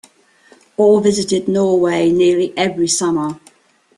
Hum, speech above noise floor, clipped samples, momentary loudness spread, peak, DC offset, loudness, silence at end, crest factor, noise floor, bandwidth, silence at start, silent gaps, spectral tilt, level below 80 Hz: none; 38 dB; under 0.1%; 9 LU; -2 dBFS; under 0.1%; -15 LUFS; 0.6 s; 14 dB; -53 dBFS; 12 kHz; 0.8 s; none; -4.5 dB/octave; -56 dBFS